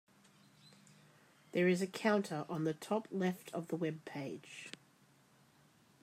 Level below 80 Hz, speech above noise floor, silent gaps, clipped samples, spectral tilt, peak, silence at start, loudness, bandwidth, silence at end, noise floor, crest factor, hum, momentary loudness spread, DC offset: -86 dBFS; 31 dB; none; under 0.1%; -6 dB/octave; -20 dBFS; 0.65 s; -38 LUFS; 16 kHz; 1.3 s; -68 dBFS; 20 dB; none; 16 LU; under 0.1%